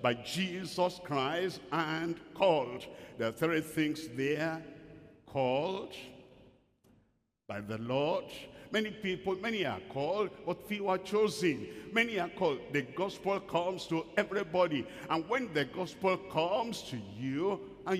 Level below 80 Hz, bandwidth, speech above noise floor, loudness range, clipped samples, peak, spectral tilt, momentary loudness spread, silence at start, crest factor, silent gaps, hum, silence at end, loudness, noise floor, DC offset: -68 dBFS; 15.5 kHz; 39 dB; 5 LU; under 0.1%; -14 dBFS; -5 dB/octave; 10 LU; 0 s; 20 dB; none; none; 0 s; -34 LUFS; -73 dBFS; under 0.1%